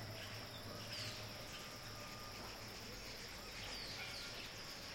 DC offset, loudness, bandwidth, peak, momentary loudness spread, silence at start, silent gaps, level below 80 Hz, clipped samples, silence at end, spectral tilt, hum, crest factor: under 0.1%; -48 LUFS; 16.5 kHz; -34 dBFS; 4 LU; 0 s; none; -64 dBFS; under 0.1%; 0 s; -2.5 dB/octave; none; 16 dB